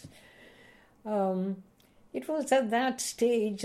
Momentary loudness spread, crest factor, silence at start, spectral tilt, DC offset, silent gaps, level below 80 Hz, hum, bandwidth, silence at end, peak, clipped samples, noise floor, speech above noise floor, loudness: 14 LU; 18 dB; 0.05 s; -4.5 dB/octave; under 0.1%; none; -70 dBFS; none; 15 kHz; 0 s; -14 dBFS; under 0.1%; -58 dBFS; 29 dB; -30 LUFS